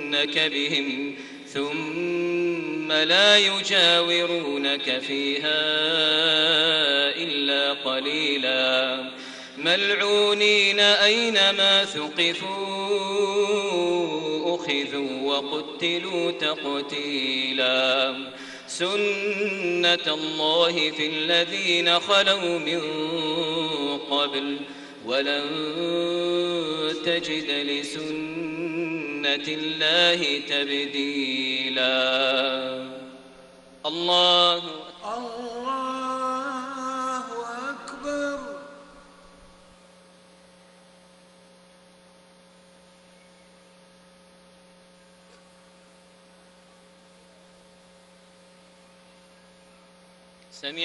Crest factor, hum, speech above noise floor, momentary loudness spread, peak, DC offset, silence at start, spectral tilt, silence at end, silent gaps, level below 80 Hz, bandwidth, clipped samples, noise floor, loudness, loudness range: 22 dB; none; 30 dB; 14 LU; -4 dBFS; under 0.1%; 0 s; -2.5 dB/octave; 0 s; none; -68 dBFS; 11.5 kHz; under 0.1%; -54 dBFS; -22 LUFS; 10 LU